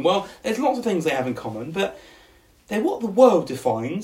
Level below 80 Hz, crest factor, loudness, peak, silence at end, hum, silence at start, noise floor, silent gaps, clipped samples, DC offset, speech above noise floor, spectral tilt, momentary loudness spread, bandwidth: -60 dBFS; 20 dB; -22 LUFS; -2 dBFS; 0 s; none; 0 s; -54 dBFS; none; under 0.1%; under 0.1%; 32 dB; -5.5 dB/octave; 12 LU; 15.5 kHz